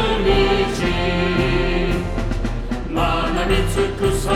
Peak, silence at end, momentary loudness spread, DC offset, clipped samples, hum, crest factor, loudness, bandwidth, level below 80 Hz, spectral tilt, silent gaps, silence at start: -4 dBFS; 0 s; 8 LU; under 0.1%; under 0.1%; none; 14 dB; -20 LUFS; 14.5 kHz; -24 dBFS; -5.5 dB/octave; none; 0 s